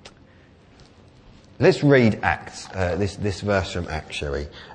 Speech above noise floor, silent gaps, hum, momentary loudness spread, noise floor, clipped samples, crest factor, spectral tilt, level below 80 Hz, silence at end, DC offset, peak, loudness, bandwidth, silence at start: 30 dB; none; none; 13 LU; -51 dBFS; under 0.1%; 22 dB; -6.5 dB/octave; -42 dBFS; 0 s; under 0.1%; -2 dBFS; -22 LUFS; 9.6 kHz; 0.05 s